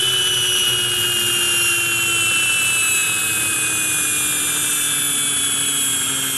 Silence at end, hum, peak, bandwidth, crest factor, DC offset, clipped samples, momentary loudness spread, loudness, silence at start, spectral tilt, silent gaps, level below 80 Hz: 0 s; none; -6 dBFS; 12.5 kHz; 12 dB; under 0.1%; under 0.1%; 2 LU; -16 LUFS; 0 s; 0.5 dB/octave; none; -54 dBFS